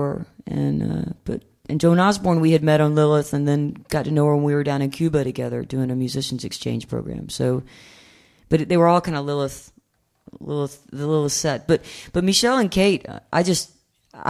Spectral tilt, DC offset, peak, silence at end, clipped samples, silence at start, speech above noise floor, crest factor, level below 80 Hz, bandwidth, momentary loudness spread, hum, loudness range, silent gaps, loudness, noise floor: -5.5 dB/octave; under 0.1%; -2 dBFS; 0 s; under 0.1%; 0 s; 41 dB; 18 dB; -48 dBFS; 14.5 kHz; 12 LU; none; 6 LU; none; -21 LUFS; -61 dBFS